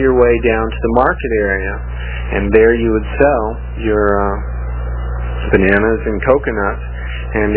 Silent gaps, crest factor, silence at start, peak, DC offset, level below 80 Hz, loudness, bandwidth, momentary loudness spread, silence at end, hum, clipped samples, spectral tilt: none; 14 dB; 0 s; 0 dBFS; under 0.1%; -22 dBFS; -15 LUFS; 4 kHz; 12 LU; 0 s; 60 Hz at -20 dBFS; under 0.1%; -11 dB/octave